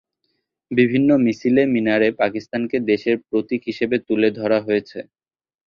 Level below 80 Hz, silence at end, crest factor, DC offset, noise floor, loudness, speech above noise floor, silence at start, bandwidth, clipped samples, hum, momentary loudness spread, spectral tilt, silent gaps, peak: -60 dBFS; 0.65 s; 16 dB; under 0.1%; -73 dBFS; -19 LUFS; 54 dB; 0.7 s; 7 kHz; under 0.1%; none; 7 LU; -7.5 dB/octave; none; -4 dBFS